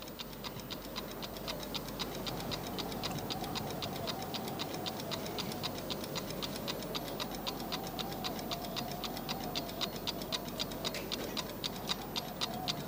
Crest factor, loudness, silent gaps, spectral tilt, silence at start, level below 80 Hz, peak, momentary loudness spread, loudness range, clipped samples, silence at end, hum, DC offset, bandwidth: 20 dB; -38 LUFS; none; -3.5 dB/octave; 0 s; -56 dBFS; -20 dBFS; 4 LU; 1 LU; under 0.1%; 0 s; none; under 0.1%; 17 kHz